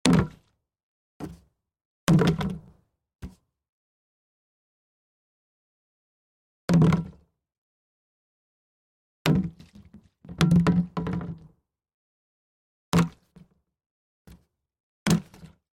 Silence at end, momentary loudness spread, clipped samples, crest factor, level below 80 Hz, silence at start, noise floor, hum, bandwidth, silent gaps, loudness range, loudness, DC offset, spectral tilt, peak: 0.35 s; 22 LU; under 0.1%; 28 dB; -50 dBFS; 0.05 s; -64 dBFS; none; 16.5 kHz; 0.83-1.20 s, 1.85-2.07 s, 3.69-6.68 s, 7.58-9.25 s, 11.94-12.92 s, 13.86-14.25 s, 14.80-15.06 s; 6 LU; -25 LUFS; under 0.1%; -6.5 dB/octave; 0 dBFS